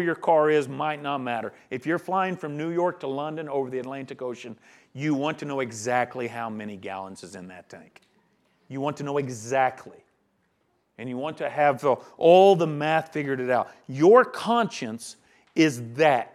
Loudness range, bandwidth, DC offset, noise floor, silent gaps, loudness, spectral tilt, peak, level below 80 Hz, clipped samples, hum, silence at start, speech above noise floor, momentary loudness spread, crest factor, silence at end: 11 LU; 13.5 kHz; under 0.1%; -70 dBFS; none; -24 LUFS; -5.5 dB/octave; -4 dBFS; -78 dBFS; under 0.1%; none; 0 s; 46 dB; 18 LU; 22 dB; 0.05 s